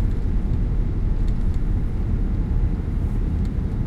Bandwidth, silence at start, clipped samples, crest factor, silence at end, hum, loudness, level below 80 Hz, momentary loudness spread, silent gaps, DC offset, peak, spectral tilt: 4.5 kHz; 0 s; under 0.1%; 12 dB; 0 s; none; -25 LUFS; -22 dBFS; 1 LU; none; under 0.1%; -8 dBFS; -9.5 dB/octave